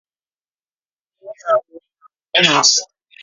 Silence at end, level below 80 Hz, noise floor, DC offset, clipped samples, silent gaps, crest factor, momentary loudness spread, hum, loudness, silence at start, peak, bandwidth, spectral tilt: 0.4 s; -66 dBFS; under -90 dBFS; under 0.1%; under 0.1%; none; 20 dB; 9 LU; none; -14 LUFS; 1.25 s; 0 dBFS; 7.8 kHz; -1 dB/octave